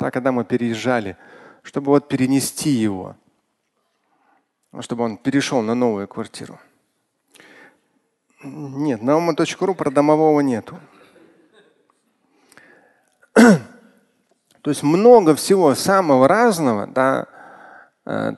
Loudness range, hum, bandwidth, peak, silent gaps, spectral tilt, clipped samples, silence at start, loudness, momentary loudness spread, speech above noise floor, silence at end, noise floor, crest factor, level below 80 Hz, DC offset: 9 LU; none; 12.5 kHz; 0 dBFS; none; -5.5 dB/octave; under 0.1%; 0 s; -17 LUFS; 19 LU; 53 dB; 0 s; -70 dBFS; 20 dB; -62 dBFS; under 0.1%